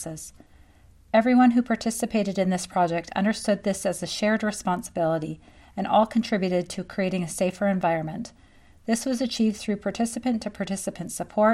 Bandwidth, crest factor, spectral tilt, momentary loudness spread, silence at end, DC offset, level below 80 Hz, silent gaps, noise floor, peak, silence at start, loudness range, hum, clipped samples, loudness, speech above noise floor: 14 kHz; 18 dB; -5 dB/octave; 12 LU; 0 s; under 0.1%; -56 dBFS; none; -54 dBFS; -6 dBFS; 0 s; 4 LU; none; under 0.1%; -25 LUFS; 29 dB